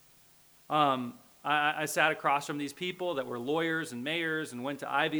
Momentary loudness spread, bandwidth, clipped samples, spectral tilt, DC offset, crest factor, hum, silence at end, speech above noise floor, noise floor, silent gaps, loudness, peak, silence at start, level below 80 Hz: 9 LU; over 20 kHz; under 0.1%; -4 dB/octave; under 0.1%; 22 dB; none; 0 s; 30 dB; -61 dBFS; none; -31 LUFS; -10 dBFS; 0.7 s; -78 dBFS